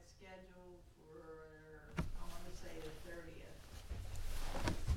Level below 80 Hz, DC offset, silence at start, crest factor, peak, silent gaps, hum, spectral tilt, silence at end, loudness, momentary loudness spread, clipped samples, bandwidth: -48 dBFS; under 0.1%; 0 s; 22 dB; -22 dBFS; none; none; -5 dB/octave; 0 s; -51 LUFS; 15 LU; under 0.1%; 16 kHz